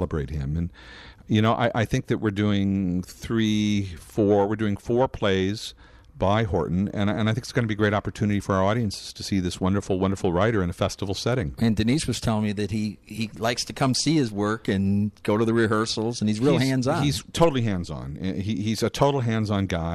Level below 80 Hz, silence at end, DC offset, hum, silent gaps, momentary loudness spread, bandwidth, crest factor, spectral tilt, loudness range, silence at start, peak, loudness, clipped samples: -44 dBFS; 0 s; under 0.1%; none; none; 8 LU; 13.5 kHz; 18 dB; -6 dB/octave; 2 LU; 0 s; -6 dBFS; -24 LUFS; under 0.1%